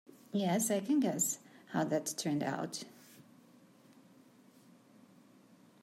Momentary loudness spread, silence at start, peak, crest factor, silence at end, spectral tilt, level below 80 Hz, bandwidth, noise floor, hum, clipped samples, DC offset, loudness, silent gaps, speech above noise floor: 11 LU; 0.35 s; -20 dBFS; 18 dB; 2.65 s; -4.5 dB/octave; -84 dBFS; 16 kHz; -62 dBFS; none; under 0.1%; under 0.1%; -35 LUFS; none; 29 dB